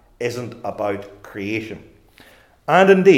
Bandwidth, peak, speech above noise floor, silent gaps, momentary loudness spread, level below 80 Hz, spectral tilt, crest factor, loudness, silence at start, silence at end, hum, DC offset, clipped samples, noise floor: 13 kHz; 0 dBFS; 32 dB; none; 21 LU; -58 dBFS; -6.5 dB/octave; 18 dB; -20 LUFS; 0.2 s; 0 s; none; under 0.1%; under 0.1%; -50 dBFS